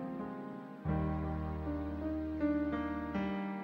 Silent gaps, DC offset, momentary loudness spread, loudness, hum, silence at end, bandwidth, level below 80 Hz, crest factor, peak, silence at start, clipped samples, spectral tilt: none; under 0.1%; 8 LU; -38 LUFS; none; 0 s; 6 kHz; -48 dBFS; 14 dB; -24 dBFS; 0 s; under 0.1%; -9.5 dB/octave